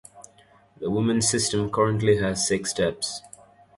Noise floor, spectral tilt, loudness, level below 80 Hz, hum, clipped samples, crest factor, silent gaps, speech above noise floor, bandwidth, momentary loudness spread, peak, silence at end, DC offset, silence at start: -56 dBFS; -4 dB/octave; -24 LUFS; -52 dBFS; none; under 0.1%; 16 dB; none; 33 dB; 11.5 kHz; 9 LU; -8 dBFS; 0.5 s; under 0.1%; 0.15 s